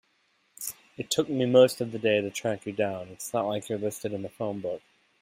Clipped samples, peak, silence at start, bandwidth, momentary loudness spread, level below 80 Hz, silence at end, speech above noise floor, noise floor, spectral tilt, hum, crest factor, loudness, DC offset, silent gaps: under 0.1%; -8 dBFS; 0.6 s; 16 kHz; 16 LU; -72 dBFS; 0.45 s; 42 dB; -70 dBFS; -4.5 dB/octave; none; 22 dB; -28 LUFS; under 0.1%; none